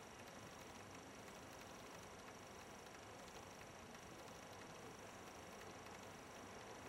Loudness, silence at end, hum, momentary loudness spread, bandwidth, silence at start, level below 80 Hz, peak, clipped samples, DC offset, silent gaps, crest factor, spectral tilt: -57 LUFS; 0 s; none; 1 LU; 16 kHz; 0 s; -76 dBFS; -42 dBFS; under 0.1%; under 0.1%; none; 16 dB; -3.5 dB/octave